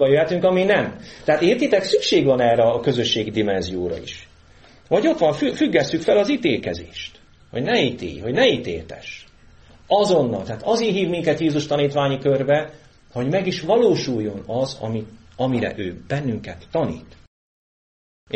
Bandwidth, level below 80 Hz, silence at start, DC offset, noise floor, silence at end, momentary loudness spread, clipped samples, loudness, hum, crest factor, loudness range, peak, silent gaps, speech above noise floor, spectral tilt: 8.4 kHz; -50 dBFS; 0 s; under 0.1%; -49 dBFS; 0 s; 14 LU; under 0.1%; -20 LUFS; none; 18 dB; 5 LU; -4 dBFS; 17.27-18.27 s; 29 dB; -5.5 dB/octave